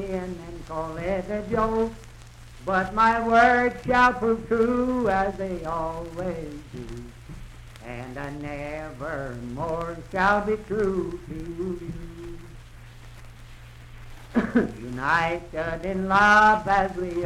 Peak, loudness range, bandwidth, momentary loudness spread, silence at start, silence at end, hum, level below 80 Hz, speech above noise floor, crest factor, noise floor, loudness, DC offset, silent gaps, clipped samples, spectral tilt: -6 dBFS; 13 LU; 14.5 kHz; 20 LU; 0 s; 0 s; none; -42 dBFS; 20 dB; 18 dB; -44 dBFS; -24 LUFS; under 0.1%; none; under 0.1%; -6 dB/octave